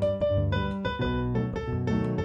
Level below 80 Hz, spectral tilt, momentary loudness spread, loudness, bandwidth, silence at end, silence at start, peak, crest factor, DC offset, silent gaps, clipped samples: -40 dBFS; -8.5 dB/octave; 4 LU; -28 LUFS; 7.6 kHz; 0 s; 0 s; -16 dBFS; 12 dB; under 0.1%; none; under 0.1%